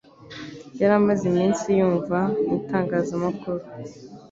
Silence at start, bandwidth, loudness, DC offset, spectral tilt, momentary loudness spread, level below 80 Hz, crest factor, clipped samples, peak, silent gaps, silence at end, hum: 0.2 s; 7.8 kHz; -23 LUFS; under 0.1%; -7 dB/octave; 19 LU; -58 dBFS; 18 dB; under 0.1%; -6 dBFS; none; 0.05 s; none